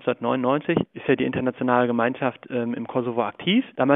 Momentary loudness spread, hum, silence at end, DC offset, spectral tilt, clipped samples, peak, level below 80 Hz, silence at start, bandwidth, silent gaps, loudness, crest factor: 6 LU; none; 0 s; under 0.1%; -10 dB/octave; under 0.1%; -2 dBFS; -60 dBFS; 0.05 s; 3.9 kHz; none; -24 LUFS; 20 dB